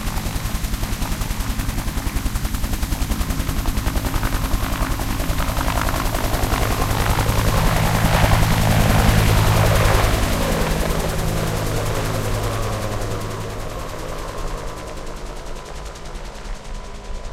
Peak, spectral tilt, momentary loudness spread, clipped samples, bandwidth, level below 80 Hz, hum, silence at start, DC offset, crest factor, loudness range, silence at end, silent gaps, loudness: 0 dBFS; -5 dB/octave; 17 LU; under 0.1%; 16 kHz; -24 dBFS; none; 0 s; under 0.1%; 18 dB; 12 LU; 0 s; none; -21 LUFS